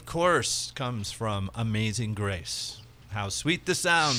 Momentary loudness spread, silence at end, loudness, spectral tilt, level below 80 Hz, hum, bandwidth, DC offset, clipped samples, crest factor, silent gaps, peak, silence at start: 10 LU; 0 s; -28 LUFS; -3.5 dB/octave; -52 dBFS; none; 15.5 kHz; under 0.1%; under 0.1%; 18 dB; none; -10 dBFS; 0 s